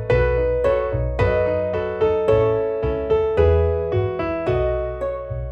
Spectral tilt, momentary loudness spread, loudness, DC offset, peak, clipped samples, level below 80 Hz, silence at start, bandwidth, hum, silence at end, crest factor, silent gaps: -9 dB/octave; 6 LU; -20 LUFS; under 0.1%; -4 dBFS; under 0.1%; -30 dBFS; 0 s; 7.8 kHz; none; 0 s; 16 dB; none